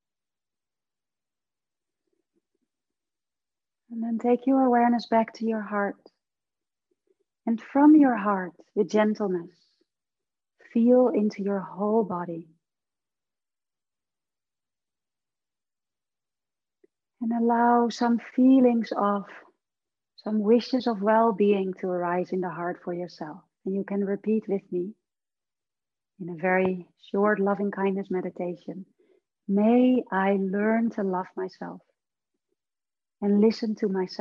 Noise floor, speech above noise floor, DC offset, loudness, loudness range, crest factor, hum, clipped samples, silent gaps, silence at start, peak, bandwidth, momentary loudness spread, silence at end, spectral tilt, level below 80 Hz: under -90 dBFS; over 66 dB; under 0.1%; -25 LUFS; 7 LU; 18 dB; none; under 0.1%; none; 3.9 s; -8 dBFS; 7.2 kHz; 15 LU; 0.05 s; -8 dB/octave; -78 dBFS